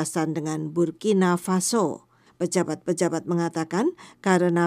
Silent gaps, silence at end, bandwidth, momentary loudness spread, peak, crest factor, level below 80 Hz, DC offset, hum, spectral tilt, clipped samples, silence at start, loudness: none; 0 s; 15.5 kHz; 7 LU; -8 dBFS; 16 dB; -72 dBFS; under 0.1%; none; -5.5 dB/octave; under 0.1%; 0 s; -25 LUFS